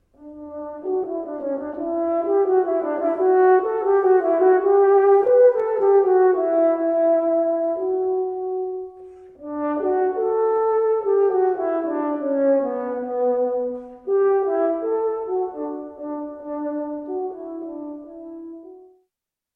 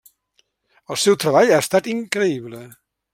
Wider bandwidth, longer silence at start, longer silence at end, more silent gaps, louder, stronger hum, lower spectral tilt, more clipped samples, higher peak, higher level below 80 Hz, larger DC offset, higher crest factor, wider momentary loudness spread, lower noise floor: second, 2.8 kHz vs 16.5 kHz; second, 0.2 s vs 0.9 s; first, 0.75 s vs 0.45 s; neither; about the same, -20 LUFS vs -18 LUFS; neither; first, -8.5 dB/octave vs -4 dB/octave; neither; second, -6 dBFS vs -2 dBFS; about the same, -64 dBFS vs -66 dBFS; neither; about the same, 14 dB vs 18 dB; about the same, 17 LU vs 16 LU; first, -83 dBFS vs -65 dBFS